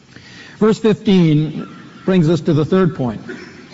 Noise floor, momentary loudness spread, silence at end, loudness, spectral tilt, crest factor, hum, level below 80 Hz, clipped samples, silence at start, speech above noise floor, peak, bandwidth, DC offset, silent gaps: -39 dBFS; 17 LU; 0.2 s; -15 LUFS; -7.5 dB/octave; 12 dB; none; -48 dBFS; under 0.1%; 0.35 s; 25 dB; -4 dBFS; 8 kHz; under 0.1%; none